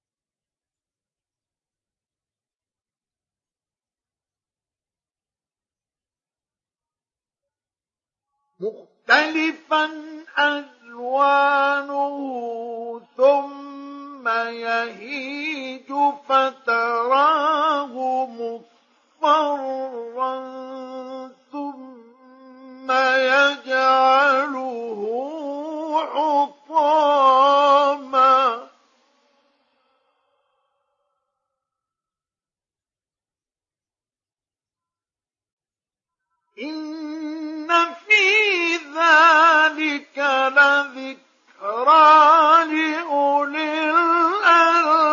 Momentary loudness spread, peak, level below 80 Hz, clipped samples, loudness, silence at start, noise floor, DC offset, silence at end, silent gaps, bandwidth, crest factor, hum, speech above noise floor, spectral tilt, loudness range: 18 LU; -2 dBFS; -88 dBFS; under 0.1%; -18 LUFS; 8.6 s; under -90 dBFS; under 0.1%; 0 s; 35.53-35.57 s; 7.4 kHz; 18 dB; none; over 71 dB; -2 dB/octave; 10 LU